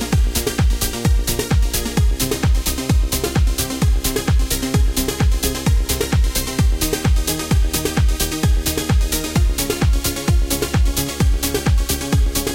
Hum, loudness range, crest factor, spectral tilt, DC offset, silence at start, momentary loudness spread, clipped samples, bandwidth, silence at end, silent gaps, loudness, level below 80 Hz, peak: none; 0 LU; 14 dB; -4.5 dB/octave; 0.2%; 0 s; 1 LU; under 0.1%; 17 kHz; 0 s; none; -19 LUFS; -20 dBFS; -4 dBFS